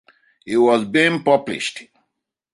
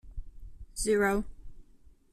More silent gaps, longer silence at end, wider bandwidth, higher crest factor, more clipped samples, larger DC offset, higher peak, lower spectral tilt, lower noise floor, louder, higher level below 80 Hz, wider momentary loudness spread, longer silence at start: neither; first, 0.7 s vs 0.25 s; second, 11.5 kHz vs 13.5 kHz; about the same, 18 dB vs 18 dB; neither; neither; first, -2 dBFS vs -16 dBFS; about the same, -4.5 dB/octave vs -4.5 dB/octave; first, -77 dBFS vs -57 dBFS; first, -18 LUFS vs -29 LUFS; second, -64 dBFS vs -46 dBFS; second, 10 LU vs 22 LU; first, 0.45 s vs 0.05 s